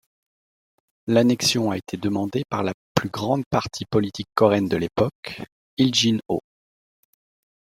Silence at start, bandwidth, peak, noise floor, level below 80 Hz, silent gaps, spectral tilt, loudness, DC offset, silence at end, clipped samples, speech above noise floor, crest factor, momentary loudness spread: 1.05 s; 16 kHz; -2 dBFS; under -90 dBFS; -56 dBFS; 2.74-2.95 s, 3.46-3.51 s, 5.15-5.23 s, 5.52-5.77 s; -5 dB/octave; -22 LUFS; under 0.1%; 1.25 s; under 0.1%; over 68 dB; 22 dB; 10 LU